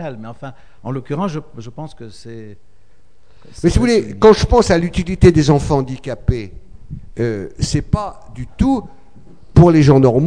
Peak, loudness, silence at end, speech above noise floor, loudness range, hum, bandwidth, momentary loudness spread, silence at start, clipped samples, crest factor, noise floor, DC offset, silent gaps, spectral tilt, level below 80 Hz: 0 dBFS; -15 LUFS; 0 s; 38 dB; 11 LU; none; 10 kHz; 24 LU; 0 s; 0.1%; 16 dB; -53 dBFS; 2%; none; -7 dB/octave; -28 dBFS